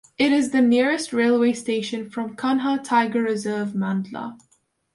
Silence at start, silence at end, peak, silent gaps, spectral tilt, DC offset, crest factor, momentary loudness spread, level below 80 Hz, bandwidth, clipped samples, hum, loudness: 0.2 s; 0.6 s; -6 dBFS; none; -5 dB/octave; under 0.1%; 14 dB; 11 LU; -66 dBFS; 11.5 kHz; under 0.1%; none; -22 LUFS